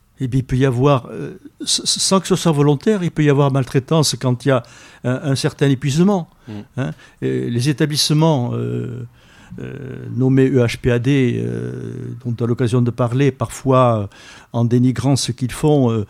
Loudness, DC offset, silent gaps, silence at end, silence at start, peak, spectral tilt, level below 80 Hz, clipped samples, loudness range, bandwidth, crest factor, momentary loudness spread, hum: -17 LUFS; under 0.1%; none; 0.05 s; 0.2 s; -2 dBFS; -5.5 dB/octave; -44 dBFS; under 0.1%; 3 LU; 15 kHz; 16 dB; 14 LU; none